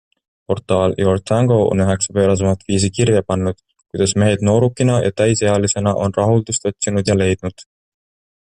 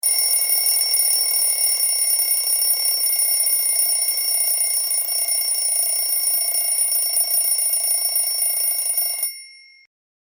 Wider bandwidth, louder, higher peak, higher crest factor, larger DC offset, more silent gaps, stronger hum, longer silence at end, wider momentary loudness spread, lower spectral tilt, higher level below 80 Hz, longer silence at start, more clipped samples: second, 10.5 kHz vs over 20 kHz; about the same, -16 LUFS vs -16 LUFS; about the same, -4 dBFS vs -4 dBFS; about the same, 14 dB vs 16 dB; neither; neither; neither; about the same, 0.8 s vs 0.8 s; first, 6 LU vs 3 LU; first, -5.5 dB/octave vs 7.5 dB/octave; first, -48 dBFS vs under -90 dBFS; first, 0.5 s vs 0.05 s; neither